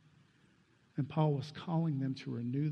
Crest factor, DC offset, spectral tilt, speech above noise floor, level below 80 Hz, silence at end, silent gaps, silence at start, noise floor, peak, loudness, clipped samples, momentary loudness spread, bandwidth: 18 dB; under 0.1%; -9 dB/octave; 34 dB; -76 dBFS; 0 s; none; 0.95 s; -69 dBFS; -18 dBFS; -36 LUFS; under 0.1%; 7 LU; 6.8 kHz